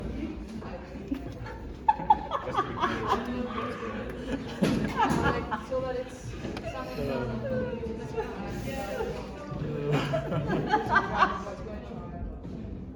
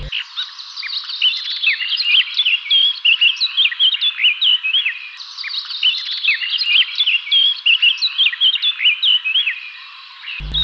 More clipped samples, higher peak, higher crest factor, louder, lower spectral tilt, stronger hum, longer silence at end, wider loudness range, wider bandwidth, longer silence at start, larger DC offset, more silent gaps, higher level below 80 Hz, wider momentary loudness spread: neither; second, -8 dBFS vs -4 dBFS; first, 22 dB vs 12 dB; second, -31 LUFS vs -14 LUFS; first, -6.5 dB/octave vs 0 dB/octave; neither; about the same, 0 s vs 0 s; first, 5 LU vs 2 LU; first, 19 kHz vs 8 kHz; about the same, 0 s vs 0 s; neither; neither; about the same, -44 dBFS vs -44 dBFS; about the same, 13 LU vs 15 LU